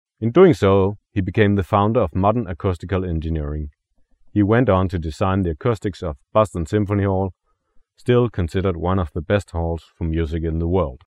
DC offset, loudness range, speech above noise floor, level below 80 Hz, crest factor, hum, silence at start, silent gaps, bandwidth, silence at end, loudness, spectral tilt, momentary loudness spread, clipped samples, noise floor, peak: under 0.1%; 4 LU; 39 dB; -36 dBFS; 18 dB; none; 0.2 s; none; 11 kHz; 0.15 s; -20 LUFS; -8.5 dB/octave; 9 LU; under 0.1%; -57 dBFS; -2 dBFS